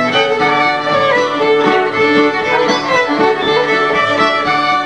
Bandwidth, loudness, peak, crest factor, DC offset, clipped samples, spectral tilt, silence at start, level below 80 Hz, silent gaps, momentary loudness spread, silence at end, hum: 10 kHz; -12 LUFS; 0 dBFS; 12 dB; 0.3%; under 0.1%; -4 dB/octave; 0 s; -52 dBFS; none; 2 LU; 0 s; none